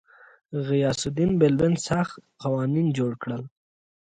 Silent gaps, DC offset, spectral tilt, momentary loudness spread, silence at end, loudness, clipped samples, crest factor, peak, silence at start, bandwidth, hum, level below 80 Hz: none; under 0.1%; -6.5 dB/octave; 13 LU; 0.7 s; -25 LUFS; under 0.1%; 18 dB; -6 dBFS; 0.5 s; 9.6 kHz; none; -54 dBFS